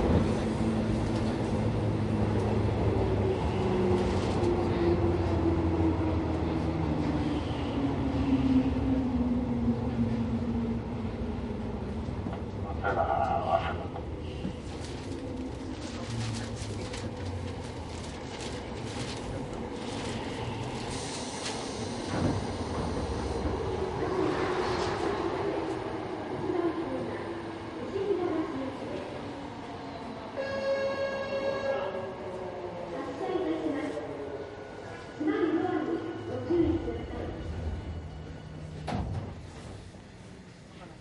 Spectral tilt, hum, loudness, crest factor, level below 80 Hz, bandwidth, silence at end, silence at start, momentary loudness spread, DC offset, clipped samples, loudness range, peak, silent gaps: -6.5 dB/octave; none; -32 LUFS; 18 dB; -42 dBFS; 11.5 kHz; 0 s; 0 s; 11 LU; under 0.1%; under 0.1%; 8 LU; -12 dBFS; none